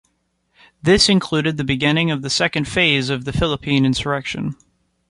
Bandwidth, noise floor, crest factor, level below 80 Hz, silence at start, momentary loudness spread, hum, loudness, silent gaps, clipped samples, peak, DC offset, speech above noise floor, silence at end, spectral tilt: 11.5 kHz; -67 dBFS; 18 dB; -40 dBFS; 0.85 s; 9 LU; none; -18 LUFS; none; under 0.1%; -2 dBFS; under 0.1%; 49 dB; 0.55 s; -4.5 dB/octave